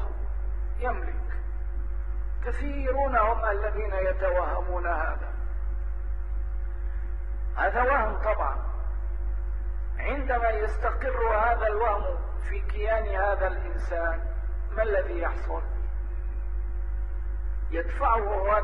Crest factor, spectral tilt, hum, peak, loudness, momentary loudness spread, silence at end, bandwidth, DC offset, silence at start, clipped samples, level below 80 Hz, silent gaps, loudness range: 16 dB; -8.5 dB/octave; none; -12 dBFS; -29 LUFS; 10 LU; 0 s; 4.1 kHz; 2%; 0 s; under 0.1%; -30 dBFS; none; 4 LU